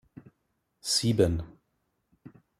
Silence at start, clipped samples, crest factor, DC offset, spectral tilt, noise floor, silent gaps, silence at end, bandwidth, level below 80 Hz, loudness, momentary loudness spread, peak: 0.85 s; under 0.1%; 22 dB; under 0.1%; -4.5 dB/octave; -77 dBFS; none; 0.3 s; 16 kHz; -52 dBFS; -27 LUFS; 15 LU; -10 dBFS